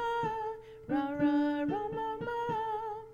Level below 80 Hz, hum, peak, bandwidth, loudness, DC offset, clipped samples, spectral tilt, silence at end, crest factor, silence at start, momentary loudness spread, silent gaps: -60 dBFS; none; -20 dBFS; 7 kHz; -33 LUFS; under 0.1%; under 0.1%; -7.5 dB/octave; 0 s; 14 dB; 0 s; 9 LU; none